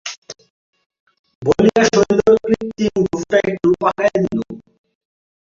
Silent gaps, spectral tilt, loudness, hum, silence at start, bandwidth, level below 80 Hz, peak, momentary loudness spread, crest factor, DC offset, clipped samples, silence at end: 0.18-0.22 s, 0.50-0.73 s, 0.86-0.90 s, 1.00-1.06 s, 1.19-1.24 s, 1.35-1.41 s; -5.5 dB/octave; -16 LUFS; none; 0.05 s; 7.6 kHz; -48 dBFS; -2 dBFS; 14 LU; 16 dB; under 0.1%; under 0.1%; 0.9 s